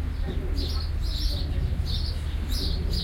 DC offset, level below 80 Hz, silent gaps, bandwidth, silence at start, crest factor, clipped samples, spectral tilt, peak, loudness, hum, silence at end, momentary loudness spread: under 0.1%; -28 dBFS; none; 16.5 kHz; 0 s; 12 dB; under 0.1%; -5.5 dB/octave; -14 dBFS; -29 LUFS; none; 0 s; 2 LU